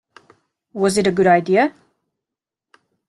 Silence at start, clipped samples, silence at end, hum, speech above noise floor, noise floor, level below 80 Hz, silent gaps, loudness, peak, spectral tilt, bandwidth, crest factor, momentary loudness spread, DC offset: 0.75 s; under 0.1%; 1.4 s; none; 70 dB; -86 dBFS; -58 dBFS; none; -17 LUFS; -2 dBFS; -5.5 dB/octave; 12 kHz; 18 dB; 8 LU; under 0.1%